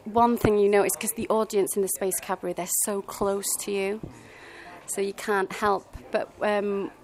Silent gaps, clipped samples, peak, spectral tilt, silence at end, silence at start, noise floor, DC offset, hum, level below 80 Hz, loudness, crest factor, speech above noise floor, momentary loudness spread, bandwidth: none; under 0.1%; -6 dBFS; -3.5 dB/octave; 0.1 s; 0.05 s; -45 dBFS; under 0.1%; none; -52 dBFS; -26 LUFS; 20 dB; 19 dB; 13 LU; 16 kHz